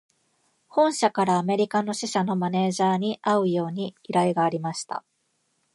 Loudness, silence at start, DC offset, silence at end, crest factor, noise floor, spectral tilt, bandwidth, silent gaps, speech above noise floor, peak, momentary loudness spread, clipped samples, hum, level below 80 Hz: -24 LUFS; 0.75 s; under 0.1%; 0.75 s; 18 dB; -72 dBFS; -5.5 dB/octave; 11.5 kHz; none; 48 dB; -6 dBFS; 9 LU; under 0.1%; none; -74 dBFS